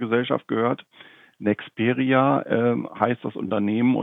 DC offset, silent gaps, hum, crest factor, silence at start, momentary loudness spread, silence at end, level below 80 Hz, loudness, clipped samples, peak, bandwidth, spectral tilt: under 0.1%; none; none; 20 dB; 0 s; 7 LU; 0 s; -74 dBFS; -23 LUFS; under 0.1%; -2 dBFS; 3.9 kHz; -9.5 dB/octave